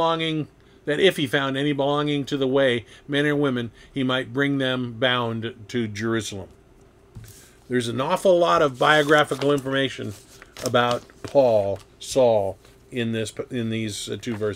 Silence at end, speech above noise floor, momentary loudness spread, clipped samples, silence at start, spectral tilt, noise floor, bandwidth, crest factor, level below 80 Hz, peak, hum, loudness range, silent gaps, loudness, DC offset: 0 s; 30 dB; 12 LU; under 0.1%; 0 s; -5 dB/octave; -53 dBFS; 16.5 kHz; 20 dB; -56 dBFS; -4 dBFS; none; 5 LU; none; -23 LUFS; under 0.1%